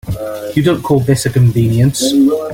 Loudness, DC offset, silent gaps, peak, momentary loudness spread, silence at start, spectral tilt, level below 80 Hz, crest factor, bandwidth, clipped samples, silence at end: -13 LUFS; under 0.1%; none; 0 dBFS; 6 LU; 0.05 s; -6 dB/octave; -38 dBFS; 12 dB; 16.5 kHz; under 0.1%; 0 s